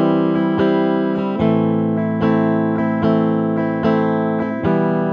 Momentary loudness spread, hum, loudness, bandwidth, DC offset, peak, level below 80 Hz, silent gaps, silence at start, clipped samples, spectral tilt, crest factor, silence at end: 3 LU; none; -17 LUFS; 5.4 kHz; under 0.1%; -2 dBFS; -50 dBFS; none; 0 s; under 0.1%; -10 dB/octave; 14 dB; 0 s